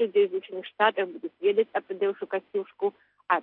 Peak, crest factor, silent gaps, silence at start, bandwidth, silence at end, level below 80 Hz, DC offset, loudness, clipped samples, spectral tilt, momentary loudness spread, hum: -8 dBFS; 18 dB; none; 0 s; 4.1 kHz; 0 s; -88 dBFS; under 0.1%; -28 LUFS; under 0.1%; -7.5 dB/octave; 9 LU; none